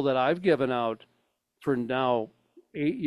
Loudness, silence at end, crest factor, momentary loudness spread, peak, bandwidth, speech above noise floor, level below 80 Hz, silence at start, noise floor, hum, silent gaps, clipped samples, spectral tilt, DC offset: -28 LUFS; 0 s; 18 dB; 15 LU; -10 dBFS; 12 kHz; 47 dB; -68 dBFS; 0 s; -74 dBFS; none; none; under 0.1%; -7.5 dB/octave; under 0.1%